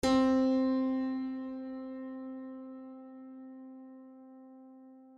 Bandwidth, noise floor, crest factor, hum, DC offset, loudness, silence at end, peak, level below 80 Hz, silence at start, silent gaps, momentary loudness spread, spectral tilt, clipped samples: 11.5 kHz; -55 dBFS; 16 dB; none; under 0.1%; -33 LUFS; 0 s; -18 dBFS; -62 dBFS; 0.05 s; none; 26 LU; -5 dB/octave; under 0.1%